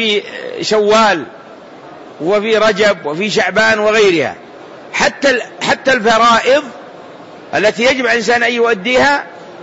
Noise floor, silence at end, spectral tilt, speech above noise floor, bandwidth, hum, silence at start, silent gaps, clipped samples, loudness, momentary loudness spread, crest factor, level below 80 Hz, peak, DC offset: -35 dBFS; 0 s; -3 dB/octave; 22 dB; 8 kHz; none; 0 s; none; under 0.1%; -12 LUFS; 11 LU; 12 dB; -50 dBFS; 0 dBFS; under 0.1%